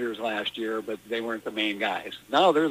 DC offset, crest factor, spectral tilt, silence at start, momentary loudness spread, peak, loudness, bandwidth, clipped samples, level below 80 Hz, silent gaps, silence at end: under 0.1%; 18 dB; -4 dB/octave; 0 s; 10 LU; -10 dBFS; -27 LUFS; 15.5 kHz; under 0.1%; -68 dBFS; none; 0 s